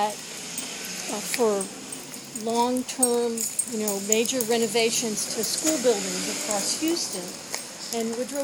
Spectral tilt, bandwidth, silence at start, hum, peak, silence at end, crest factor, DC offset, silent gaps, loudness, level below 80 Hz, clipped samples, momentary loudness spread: -2 dB/octave; 20 kHz; 0 s; none; -4 dBFS; 0 s; 22 dB; under 0.1%; none; -25 LUFS; -70 dBFS; under 0.1%; 10 LU